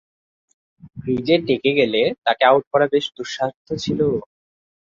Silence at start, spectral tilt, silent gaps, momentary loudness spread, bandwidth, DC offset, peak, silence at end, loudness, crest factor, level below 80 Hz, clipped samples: 0.85 s; -5.5 dB/octave; 2.18-2.22 s, 2.67-2.71 s, 3.56-3.65 s; 11 LU; 7.6 kHz; under 0.1%; -2 dBFS; 0.7 s; -19 LUFS; 18 dB; -54 dBFS; under 0.1%